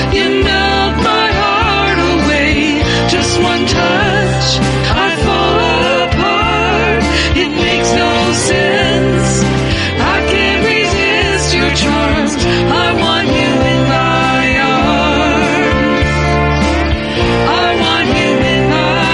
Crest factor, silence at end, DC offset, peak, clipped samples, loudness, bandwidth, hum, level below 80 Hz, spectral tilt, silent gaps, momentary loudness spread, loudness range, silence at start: 10 dB; 0 s; under 0.1%; 0 dBFS; under 0.1%; -11 LUFS; 11.5 kHz; none; -24 dBFS; -4.5 dB/octave; none; 2 LU; 1 LU; 0 s